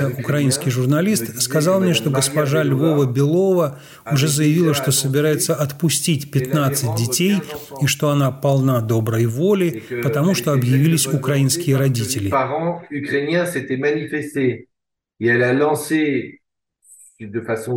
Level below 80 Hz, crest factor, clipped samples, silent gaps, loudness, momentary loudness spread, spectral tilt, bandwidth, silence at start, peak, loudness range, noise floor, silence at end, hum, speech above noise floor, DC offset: -60 dBFS; 12 dB; under 0.1%; none; -18 LUFS; 7 LU; -5 dB/octave; 17 kHz; 0 s; -6 dBFS; 4 LU; -79 dBFS; 0 s; none; 61 dB; under 0.1%